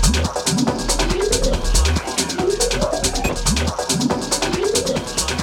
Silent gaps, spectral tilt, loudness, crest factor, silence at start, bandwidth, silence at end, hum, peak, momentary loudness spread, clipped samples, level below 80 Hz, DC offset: none; -3.5 dB/octave; -19 LUFS; 16 dB; 0 s; 17.5 kHz; 0 s; none; -4 dBFS; 2 LU; under 0.1%; -24 dBFS; under 0.1%